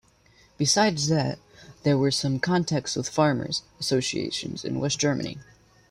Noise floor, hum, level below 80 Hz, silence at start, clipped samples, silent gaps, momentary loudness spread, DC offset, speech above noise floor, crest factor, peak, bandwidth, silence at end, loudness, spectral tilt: -58 dBFS; none; -58 dBFS; 0.6 s; under 0.1%; none; 9 LU; under 0.1%; 34 dB; 18 dB; -8 dBFS; 14 kHz; 0.5 s; -25 LUFS; -4.5 dB/octave